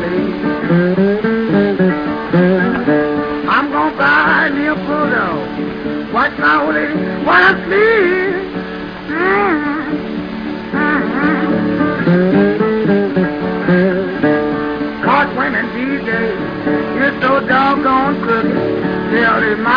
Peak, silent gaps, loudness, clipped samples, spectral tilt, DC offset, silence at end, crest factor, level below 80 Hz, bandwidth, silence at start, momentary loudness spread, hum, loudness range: 0 dBFS; none; -14 LUFS; under 0.1%; -8.5 dB/octave; under 0.1%; 0 s; 14 dB; -42 dBFS; 5.2 kHz; 0 s; 8 LU; none; 2 LU